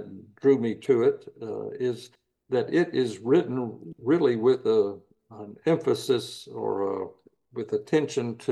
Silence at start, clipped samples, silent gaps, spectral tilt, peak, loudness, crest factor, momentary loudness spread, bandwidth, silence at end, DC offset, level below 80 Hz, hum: 0 s; under 0.1%; none; -6.5 dB/octave; -10 dBFS; -26 LUFS; 16 dB; 14 LU; 12.5 kHz; 0 s; under 0.1%; -76 dBFS; none